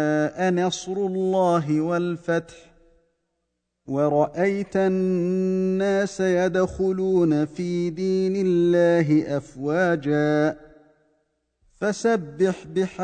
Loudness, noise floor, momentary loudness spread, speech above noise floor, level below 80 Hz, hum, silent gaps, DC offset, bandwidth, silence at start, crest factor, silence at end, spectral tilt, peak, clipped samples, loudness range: -23 LUFS; -77 dBFS; 6 LU; 56 dB; -56 dBFS; none; none; under 0.1%; 9.4 kHz; 0 s; 14 dB; 0 s; -6.5 dB/octave; -8 dBFS; under 0.1%; 4 LU